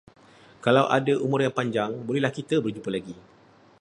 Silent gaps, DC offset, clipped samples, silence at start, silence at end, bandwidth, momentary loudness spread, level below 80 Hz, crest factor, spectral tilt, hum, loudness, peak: none; under 0.1%; under 0.1%; 0.65 s; 0.6 s; 11 kHz; 11 LU; -66 dBFS; 22 dB; -6.5 dB/octave; none; -25 LUFS; -4 dBFS